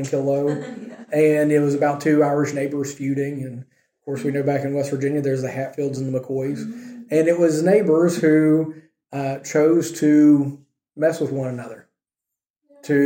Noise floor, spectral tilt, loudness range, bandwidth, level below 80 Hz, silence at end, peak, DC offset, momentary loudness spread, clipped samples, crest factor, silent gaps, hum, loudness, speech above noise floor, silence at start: -86 dBFS; -7 dB/octave; 6 LU; 16.5 kHz; -68 dBFS; 0 s; -4 dBFS; under 0.1%; 15 LU; under 0.1%; 16 dB; 12.50-12.54 s; none; -20 LUFS; 67 dB; 0 s